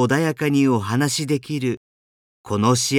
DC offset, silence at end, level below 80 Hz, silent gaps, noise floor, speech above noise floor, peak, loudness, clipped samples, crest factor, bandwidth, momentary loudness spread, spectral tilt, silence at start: under 0.1%; 0 s; -60 dBFS; 1.77-2.44 s; under -90 dBFS; over 71 dB; -6 dBFS; -21 LUFS; under 0.1%; 14 dB; 17.5 kHz; 8 LU; -5 dB/octave; 0 s